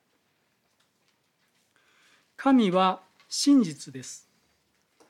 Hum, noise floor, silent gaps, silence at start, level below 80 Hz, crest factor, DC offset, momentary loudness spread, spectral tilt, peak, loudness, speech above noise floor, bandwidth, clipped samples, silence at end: none; -72 dBFS; none; 2.4 s; -78 dBFS; 18 dB; under 0.1%; 19 LU; -4.5 dB/octave; -10 dBFS; -24 LUFS; 48 dB; 13.5 kHz; under 0.1%; 0.95 s